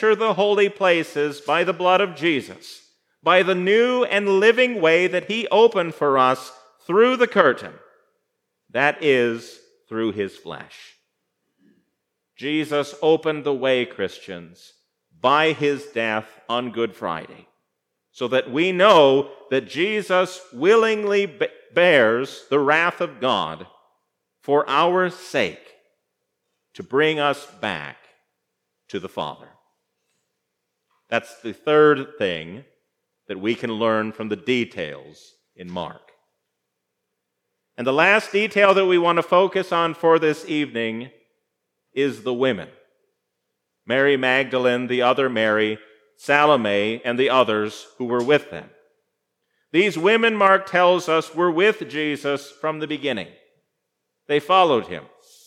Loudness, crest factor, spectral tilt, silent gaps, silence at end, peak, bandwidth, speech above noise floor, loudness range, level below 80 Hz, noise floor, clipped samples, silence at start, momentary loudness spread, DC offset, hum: -20 LUFS; 20 dB; -5 dB/octave; none; 0.45 s; 0 dBFS; 13 kHz; 58 dB; 8 LU; -74 dBFS; -78 dBFS; under 0.1%; 0 s; 15 LU; under 0.1%; none